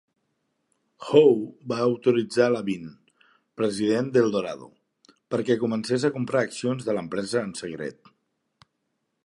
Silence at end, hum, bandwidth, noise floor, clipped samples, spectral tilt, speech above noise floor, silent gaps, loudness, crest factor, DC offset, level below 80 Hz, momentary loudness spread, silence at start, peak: 1.3 s; none; 11.5 kHz; -77 dBFS; under 0.1%; -6 dB/octave; 53 dB; none; -24 LUFS; 22 dB; under 0.1%; -68 dBFS; 14 LU; 1 s; -4 dBFS